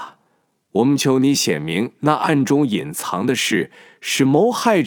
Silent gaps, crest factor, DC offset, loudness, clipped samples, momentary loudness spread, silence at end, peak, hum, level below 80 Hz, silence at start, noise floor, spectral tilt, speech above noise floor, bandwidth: none; 16 dB; under 0.1%; -18 LUFS; under 0.1%; 8 LU; 0 s; -2 dBFS; none; -64 dBFS; 0 s; -65 dBFS; -4.5 dB/octave; 47 dB; 19.5 kHz